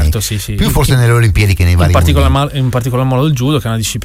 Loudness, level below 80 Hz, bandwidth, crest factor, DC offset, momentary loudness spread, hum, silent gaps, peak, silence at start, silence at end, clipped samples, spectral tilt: -12 LUFS; -20 dBFS; 16.5 kHz; 10 dB; under 0.1%; 5 LU; none; none; 0 dBFS; 0 s; 0 s; under 0.1%; -5.5 dB/octave